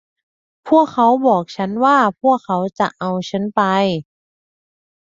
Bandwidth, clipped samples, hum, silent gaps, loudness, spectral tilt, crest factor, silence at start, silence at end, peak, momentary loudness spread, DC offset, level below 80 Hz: 7.8 kHz; under 0.1%; none; none; -16 LUFS; -6.5 dB/octave; 16 dB; 0.65 s; 1.05 s; -2 dBFS; 8 LU; under 0.1%; -62 dBFS